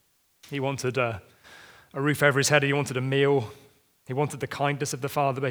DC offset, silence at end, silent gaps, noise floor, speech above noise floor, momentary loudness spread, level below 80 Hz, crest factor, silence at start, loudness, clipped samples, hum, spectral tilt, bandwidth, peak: under 0.1%; 0 s; none; -57 dBFS; 32 dB; 12 LU; -68 dBFS; 24 dB; 0.45 s; -26 LUFS; under 0.1%; none; -4.5 dB/octave; over 20 kHz; -4 dBFS